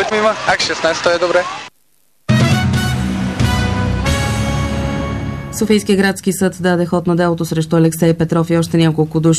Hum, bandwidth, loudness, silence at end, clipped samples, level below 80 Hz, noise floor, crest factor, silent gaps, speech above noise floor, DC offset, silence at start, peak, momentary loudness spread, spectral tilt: none; 14 kHz; -15 LUFS; 0 s; under 0.1%; -30 dBFS; -60 dBFS; 12 dB; none; 46 dB; 0.2%; 0 s; -2 dBFS; 7 LU; -5.5 dB/octave